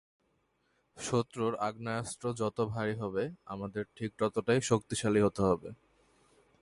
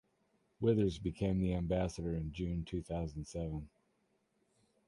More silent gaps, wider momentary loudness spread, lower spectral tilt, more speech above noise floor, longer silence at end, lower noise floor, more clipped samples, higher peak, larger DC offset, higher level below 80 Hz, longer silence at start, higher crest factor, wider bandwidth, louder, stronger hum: neither; about the same, 11 LU vs 9 LU; second, -5.5 dB/octave vs -7.5 dB/octave; about the same, 43 dB vs 42 dB; second, 0.85 s vs 1.2 s; about the same, -75 dBFS vs -78 dBFS; neither; first, -12 dBFS vs -18 dBFS; neither; second, -60 dBFS vs -50 dBFS; first, 0.95 s vs 0.6 s; about the same, 20 dB vs 18 dB; about the same, 11.5 kHz vs 11.5 kHz; first, -33 LUFS vs -37 LUFS; neither